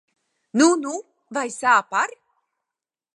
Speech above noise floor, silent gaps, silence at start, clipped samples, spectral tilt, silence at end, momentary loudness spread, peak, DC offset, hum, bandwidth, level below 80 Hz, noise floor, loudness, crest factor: 68 dB; none; 0.55 s; under 0.1%; -2.5 dB/octave; 1.1 s; 13 LU; -4 dBFS; under 0.1%; none; 11.5 kHz; -82 dBFS; -88 dBFS; -21 LUFS; 20 dB